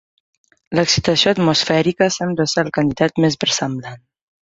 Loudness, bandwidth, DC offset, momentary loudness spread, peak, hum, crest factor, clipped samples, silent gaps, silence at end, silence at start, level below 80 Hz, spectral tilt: -17 LUFS; 8 kHz; under 0.1%; 8 LU; 0 dBFS; none; 18 dB; under 0.1%; none; 0.55 s; 0.7 s; -48 dBFS; -4 dB/octave